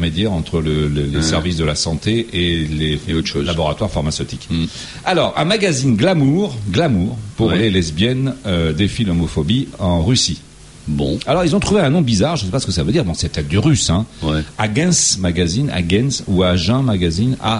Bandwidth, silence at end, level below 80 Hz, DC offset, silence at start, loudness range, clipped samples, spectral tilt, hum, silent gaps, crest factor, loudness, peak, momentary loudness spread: 11.5 kHz; 0 s; -32 dBFS; under 0.1%; 0 s; 2 LU; under 0.1%; -5 dB/octave; none; none; 14 dB; -17 LUFS; -2 dBFS; 6 LU